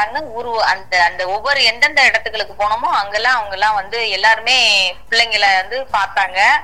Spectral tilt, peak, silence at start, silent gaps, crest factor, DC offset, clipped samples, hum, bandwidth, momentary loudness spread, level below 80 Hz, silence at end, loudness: 0 dB/octave; 0 dBFS; 0 s; none; 16 dB; 2%; under 0.1%; none; 16.5 kHz; 8 LU; -46 dBFS; 0 s; -14 LUFS